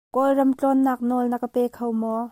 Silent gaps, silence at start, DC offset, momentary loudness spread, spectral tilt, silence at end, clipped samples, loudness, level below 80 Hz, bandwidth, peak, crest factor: none; 0.15 s; under 0.1%; 5 LU; -7 dB/octave; 0 s; under 0.1%; -22 LUFS; -66 dBFS; 16 kHz; -10 dBFS; 12 dB